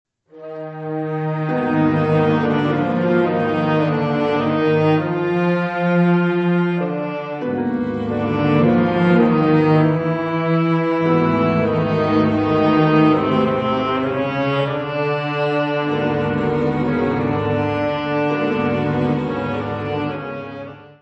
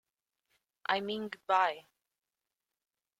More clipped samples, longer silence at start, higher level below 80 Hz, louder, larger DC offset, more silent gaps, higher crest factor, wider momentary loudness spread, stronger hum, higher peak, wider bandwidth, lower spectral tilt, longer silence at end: neither; second, 0.35 s vs 0.9 s; first, -48 dBFS vs -82 dBFS; first, -18 LUFS vs -33 LUFS; neither; neither; second, 16 dB vs 24 dB; second, 8 LU vs 12 LU; neither; first, -2 dBFS vs -14 dBFS; second, 6.2 kHz vs 14 kHz; first, -9 dB/octave vs -4.5 dB/octave; second, 0.15 s vs 1.4 s